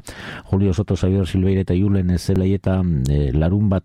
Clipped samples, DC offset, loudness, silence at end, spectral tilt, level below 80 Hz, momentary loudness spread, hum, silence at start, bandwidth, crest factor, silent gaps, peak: under 0.1%; under 0.1%; -19 LUFS; 0.05 s; -8 dB/octave; -30 dBFS; 2 LU; none; 0.05 s; 11.5 kHz; 12 dB; none; -6 dBFS